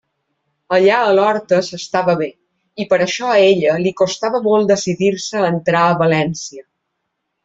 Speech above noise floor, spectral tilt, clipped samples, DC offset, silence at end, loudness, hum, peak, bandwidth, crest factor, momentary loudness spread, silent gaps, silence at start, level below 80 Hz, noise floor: 59 dB; -5 dB/octave; under 0.1%; under 0.1%; 0.85 s; -15 LUFS; none; -2 dBFS; 7.8 kHz; 14 dB; 8 LU; none; 0.7 s; -58 dBFS; -73 dBFS